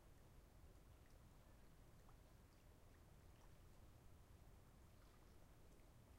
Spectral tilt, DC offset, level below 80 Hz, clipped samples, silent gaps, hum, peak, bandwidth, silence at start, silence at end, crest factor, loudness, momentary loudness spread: -5.5 dB/octave; under 0.1%; -70 dBFS; under 0.1%; none; none; -54 dBFS; 16 kHz; 0 s; 0 s; 12 dB; -69 LUFS; 1 LU